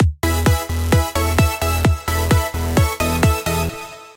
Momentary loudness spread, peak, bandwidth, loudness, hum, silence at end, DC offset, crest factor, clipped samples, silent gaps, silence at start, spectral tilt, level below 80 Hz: 4 LU; -2 dBFS; 17 kHz; -18 LUFS; none; 0.05 s; under 0.1%; 16 dB; under 0.1%; none; 0 s; -5 dB/octave; -24 dBFS